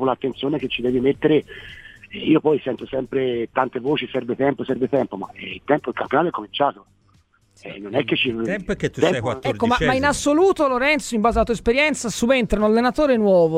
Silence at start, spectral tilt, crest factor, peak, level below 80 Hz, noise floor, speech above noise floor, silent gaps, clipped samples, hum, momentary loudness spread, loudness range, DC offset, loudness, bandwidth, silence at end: 0 s; -5 dB/octave; 18 dB; -4 dBFS; -42 dBFS; -58 dBFS; 38 dB; none; under 0.1%; none; 9 LU; 5 LU; under 0.1%; -20 LUFS; 15.5 kHz; 0 s